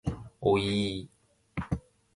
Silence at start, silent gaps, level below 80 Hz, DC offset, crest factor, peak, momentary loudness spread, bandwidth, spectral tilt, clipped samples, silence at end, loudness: 0.05 s; none; -48 dBFS; under 0.1%; 20 dB; -12 dBFS; 14 LU; 11.5 kHz; -6.5 dB/octave; under 0.1%; 0.35 s; -31 LUFS